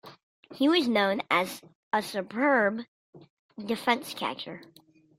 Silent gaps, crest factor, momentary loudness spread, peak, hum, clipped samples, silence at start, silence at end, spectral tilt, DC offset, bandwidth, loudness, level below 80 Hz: 0.23-0.43 s, 1.75-1.91 s, 2.88-3.13 s, 3.30-3.49 s; 20 dB; 18 LU; -8 dBFS; none; under 0.1%; 0.05 s; 0.55 s; -4 dB/octave; under 0.1%; 16 kHz; -27 LUFS; -76 dBFS